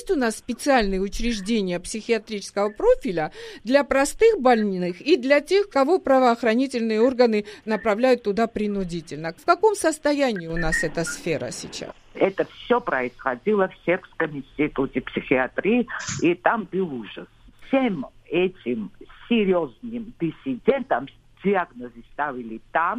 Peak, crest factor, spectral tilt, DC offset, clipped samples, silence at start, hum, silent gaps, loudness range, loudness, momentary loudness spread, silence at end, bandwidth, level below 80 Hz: -4 dBFS; 18 dB; -5 dB/octave; under 0.1%; under 0.1%; 0 s; none; none; 6 LU; -23 LUFS; 12 LU; 0 s; 15 kHz; -44 dBFS